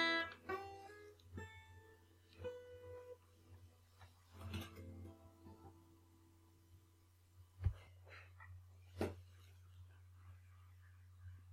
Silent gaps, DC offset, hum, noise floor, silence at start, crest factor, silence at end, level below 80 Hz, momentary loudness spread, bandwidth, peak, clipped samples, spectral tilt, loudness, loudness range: none; under 0.1%; none; -70 dBFS; 0 s; 24 dB; 0 s; -62 dBFS; 22 LU; 16 kHz; -26 dBFS; under 0.1%; -5 dB/octave; -50 LUFS; 6 LU